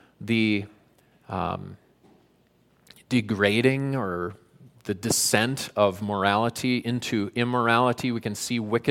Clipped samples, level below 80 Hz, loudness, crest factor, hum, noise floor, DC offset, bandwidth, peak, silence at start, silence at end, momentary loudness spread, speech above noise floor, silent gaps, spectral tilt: under 0.1%; -62 dBFS; -25 LUFS; 22 dB; none; -63 dBFS; under 0.1%; 17 kHz; -4 dBFS; 0.2 s; 0 s; 12 LU; 38 dB; none; -4.5 dB/octave